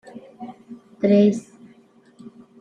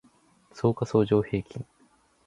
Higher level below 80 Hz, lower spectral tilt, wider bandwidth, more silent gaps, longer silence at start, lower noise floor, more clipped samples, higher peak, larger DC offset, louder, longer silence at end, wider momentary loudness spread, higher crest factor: second, -70 dBFS vs -54 dBFS; about the same, -8 dB/octave vs -8 dB/octave; second, 9.2 kHz vs 11 kHz; neither; second, 0.15 s vs 0.55 s; second, -53 dBFS vs -63 dBFS; neither; about the same, -6 dBFS vs -8 dBFS; neither; first, -19 LUFS vs -26 LUFS; first, 1.2 s vs 0.65 s; first, 26 LU vs 18 LU; about the same, 18 dB vs 20 dB